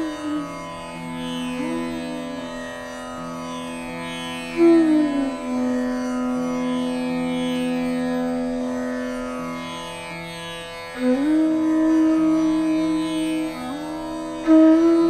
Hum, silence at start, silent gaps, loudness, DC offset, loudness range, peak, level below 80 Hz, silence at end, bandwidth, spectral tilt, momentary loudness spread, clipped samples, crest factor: none; 0 s; none; -23 LUFS; under 0.1%; 9 LU; -6 dBFS; -50 dBFS; 0 s; 13 kHz; -5.5 dB/octave; 15 LU; under 0.1%; 16 dB